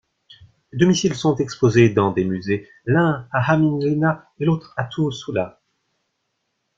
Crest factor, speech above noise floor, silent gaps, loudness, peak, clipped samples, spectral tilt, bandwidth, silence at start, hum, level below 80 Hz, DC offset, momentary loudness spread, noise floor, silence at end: 18 dB; 55 dB; none; -20 LUFS; -2 dBFS; under 0.1%; -6.5 dB/octave; 7.8 kHz; 0.75 s; none; -54 dBFS; under 0.1%; 10 LU; -74 dBFS; 1.3 s